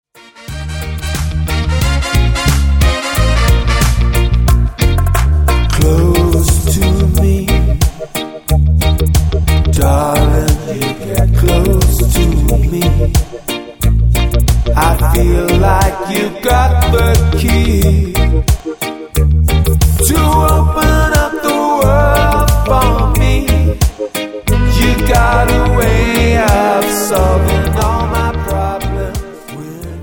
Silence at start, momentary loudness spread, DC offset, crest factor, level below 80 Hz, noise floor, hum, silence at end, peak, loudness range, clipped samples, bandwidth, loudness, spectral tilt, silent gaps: 0.4 s; 8 LU; under 0.1%; 10 dB; -14 dBFS; -31 dBFS; none; 0 s; 0 dBFS; 2 LU; under 0.1%; 17.5 kHz; -12 LUFS; -5.5 dB/octave; none